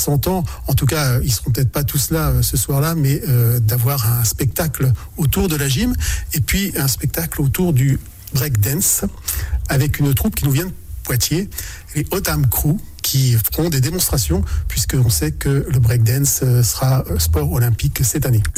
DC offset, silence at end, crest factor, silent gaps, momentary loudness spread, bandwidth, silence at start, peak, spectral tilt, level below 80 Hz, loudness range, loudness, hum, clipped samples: under 0.1%; 0 s; 10 dB; none; 6 LU; 17.5 kHz; 0 s; -6 dBFS; -5 dB/octave; -28 dBFS; 2 LU; -17 LUFS; none; under 0.1%